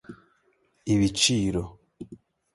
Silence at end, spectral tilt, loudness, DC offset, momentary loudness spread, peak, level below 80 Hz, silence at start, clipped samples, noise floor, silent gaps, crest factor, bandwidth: 0.4 s; -4 dB/octave; -24 LUFS; under 0.1%; 24 LU; -8 dBFS; -48 dBFS; 0.1 s; under 0.1%; -68 dBFS; none; 20 dB; 11.5 kHz